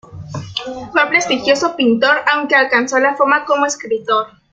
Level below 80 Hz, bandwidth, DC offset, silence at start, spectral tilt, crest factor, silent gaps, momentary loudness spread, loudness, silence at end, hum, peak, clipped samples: -56 dBFS; 9.2 kHz; under 0.1%; 0.1 s; -3 dB/octave; 16 dB; none; 12 LU; -14 LUFS; 0.25 s; none; 0 dBFS; under 0.1%